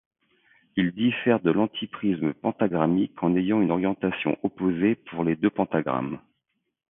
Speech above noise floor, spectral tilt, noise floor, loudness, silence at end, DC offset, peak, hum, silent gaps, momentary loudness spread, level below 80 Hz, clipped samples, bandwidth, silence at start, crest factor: 54 dB; -11.5 dB/octave; -78 dBFS; -25 LUFS; 0.7 s; under 0.1%; -6 dBFS; none; none; 6 LU; -60 dBFS; under 0.1%; 3.8 kHz; 0.75 s; 20 dB